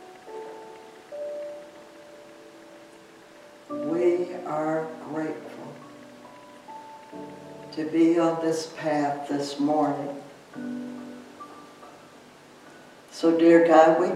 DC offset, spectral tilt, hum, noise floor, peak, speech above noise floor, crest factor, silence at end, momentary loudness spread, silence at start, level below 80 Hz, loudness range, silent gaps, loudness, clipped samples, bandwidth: under 0.1%; -6 dB/octave; none; -50 dBFS; -4 dBFS; 28 dB; 24 dB; 0 s; 27 LU; 0 s; -80 dBFS; 14 LU; none; -24 LUFS; under 0.1%; 11.5 kHz